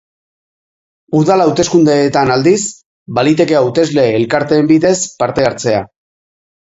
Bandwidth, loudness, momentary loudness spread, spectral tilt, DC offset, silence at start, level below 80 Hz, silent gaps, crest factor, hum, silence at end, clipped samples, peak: 8 kHz; -12 LUFS; 6 LU; -5 dB/octave; under 0.1%; 1.1 s; -48 dBFS; 2.86-3.06 s; 12 dB; none; 0.8 s; under 0.1%; 0 dBFS